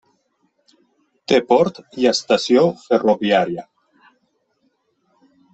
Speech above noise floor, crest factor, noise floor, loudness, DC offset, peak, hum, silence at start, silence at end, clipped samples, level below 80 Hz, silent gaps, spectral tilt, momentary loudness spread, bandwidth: 50 dB; 18 dB; -67 dBFS; -17 LUFS; under 0.1%; -2 dBFS; none; 1.3 s; 1.9 s; under 0.1%; -64 dBFS; none; -5 dB/octave; 8 LU; 8.4 kHz